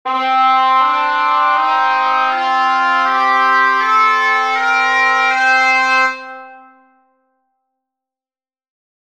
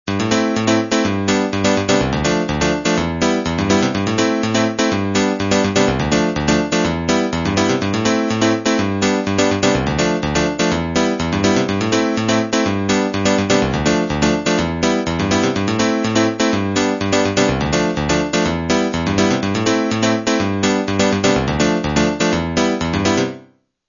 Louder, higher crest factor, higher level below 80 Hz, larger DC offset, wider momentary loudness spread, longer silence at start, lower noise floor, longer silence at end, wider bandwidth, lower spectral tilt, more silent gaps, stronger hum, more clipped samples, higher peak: first, -12 LUFS vs -17 LUFS; about the same, 14 dB vs 16 dB; second, -72 dBFS vs -36 dBFS; first, 0.3% vs under 0.1%; about the same, 3 LU vs 2 LU; about the same, 0.05 s vs 0.05 s; first, under -90 dBFS vs -49 dBFS; first, 2.5 s vs 0.5 s; first, 12.5 kHz vs 7.4 kHz; second, 1 dB/octave vs -4.5 dB/octave; neither; neither; neither; about the same, -2 dBFS vs -2 dBFS